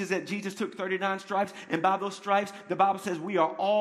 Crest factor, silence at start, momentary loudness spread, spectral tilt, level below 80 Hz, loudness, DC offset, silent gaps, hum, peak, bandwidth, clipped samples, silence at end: 20 dB; 0 s; 7 LU; -5 dB/octave; -78 dBFS; -29 LUFS; under 0.1%; none; none; -10 dBFS; 14.5 kHz; under 0.1%; 0 s